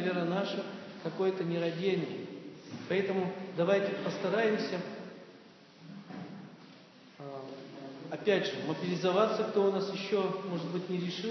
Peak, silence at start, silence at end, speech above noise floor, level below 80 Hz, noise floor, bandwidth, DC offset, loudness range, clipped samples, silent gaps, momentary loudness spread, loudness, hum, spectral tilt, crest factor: -14 dBFS; 0 s; 0 s; 24 dB; -86 dBFS; -56 dBFS; 6.4 kHz; under 0.1%; 9 LU; under 0.1%; none; 17 LU; -33 LUFS; none; -6.5 dB/octave; 18 dB